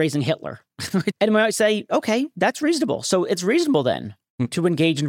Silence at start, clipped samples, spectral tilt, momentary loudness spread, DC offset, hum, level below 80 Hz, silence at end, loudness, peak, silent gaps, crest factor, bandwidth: 0 s; under 0.1%; -5 dB/octave; 10 LU; under 0.1%; none; -64 dBFS; 0 s; -21 LUFS; -6 dBFS; 4.30-4.38 s; 14 dB; 17 kHz